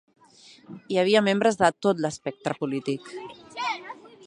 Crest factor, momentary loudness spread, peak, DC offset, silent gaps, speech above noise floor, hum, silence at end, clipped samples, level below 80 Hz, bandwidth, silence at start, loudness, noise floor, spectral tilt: 22 dB; 19 LU; -4 dBFS; under 0.1%; none; 29 dB; none; 0.2 s; under 0.1%; -68 dBFS; 11 kHz; 0.7 s; -25 LUFS; -53 dBFS; -5 dB/octave